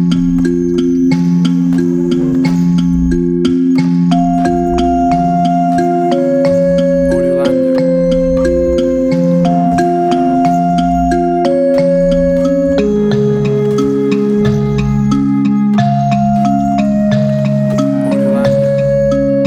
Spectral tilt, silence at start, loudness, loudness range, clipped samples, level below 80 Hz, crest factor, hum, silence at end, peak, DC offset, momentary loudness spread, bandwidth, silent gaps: -8 dB/octave; 0 s; -12 LUFS; 1 LU; under 0.1%; -30 dBFS; 10 dB; none; 0 s; 0 dBFS; under 0.1%; 2 LU; 9.6 kHz; none